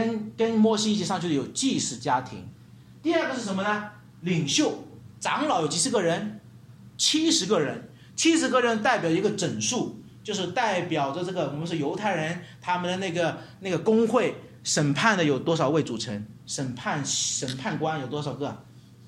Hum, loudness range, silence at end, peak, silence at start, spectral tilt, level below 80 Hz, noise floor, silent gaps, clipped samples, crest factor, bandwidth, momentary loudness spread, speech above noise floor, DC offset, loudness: none; 4 LU; 0 s; -6 dBFS; 0 s; -4 dB/octave; -66 dBFS; -48 dBFS; none; under 0.1%; 20 dB; 14.5 kHz; 12 LU; 23 dB; under 0.1%; -26 LUFS